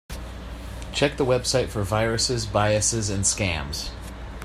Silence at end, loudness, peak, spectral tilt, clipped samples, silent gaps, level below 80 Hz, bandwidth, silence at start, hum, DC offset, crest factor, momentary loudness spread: 0 s; -23 LUFS; -6 dBFS; -3.5 dB/octave; under 0.1%; none; -38 dBFS; 15 kHz; 0.1 s; none; under 0.1%; 18 dB; 16 LU